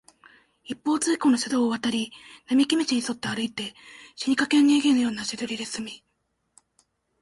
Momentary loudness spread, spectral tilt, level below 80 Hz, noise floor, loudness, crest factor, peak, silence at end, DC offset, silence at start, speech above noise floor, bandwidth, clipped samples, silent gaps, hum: 18 LU; -3 dB/octave; -68 dBFS; -75 dBFS; -24 LUFS; 18 dB; -8 dBFS; 1.25 s; under 0.1%; 0.7 s; 50 dB; 11.5 kHz; under 0.1%; none; none